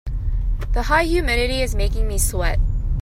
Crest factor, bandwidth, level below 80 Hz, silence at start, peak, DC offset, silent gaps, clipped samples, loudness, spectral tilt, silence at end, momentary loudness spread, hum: 16 dB; 16 kHz; -20 dBFS; 0.05 s; -2 dBFS; under 0.1%; none; under 0.1%; -21 LUFS; -4.5 dB/octave; 0 s; 8 LU; none